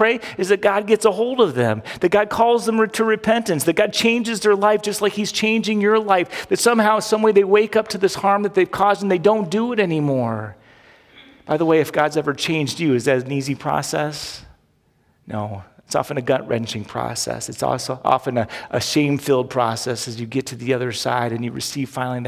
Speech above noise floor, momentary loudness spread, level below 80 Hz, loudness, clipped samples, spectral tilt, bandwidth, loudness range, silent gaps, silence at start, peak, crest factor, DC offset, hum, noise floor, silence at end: 42 dB; 9 LU; -56 dBFS; -19 LUFS; under 0.1%; -4.5 dB/octave; 16 kHz; 7 LU; none; 0 s; -2 dBFS; 18 dB; under 0.1%; none; -61 dBFS; 0 s